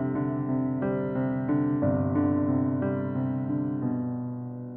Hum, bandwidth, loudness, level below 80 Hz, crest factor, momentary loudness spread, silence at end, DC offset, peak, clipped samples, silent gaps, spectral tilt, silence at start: none; 3.2 kHz; -28 LUFS; -58 dBFS; 14 dB; 5 LU; 0 s; under 0.1%; -14 dBFS; under 0.1%; none; -13.5 dB/octave; 0 s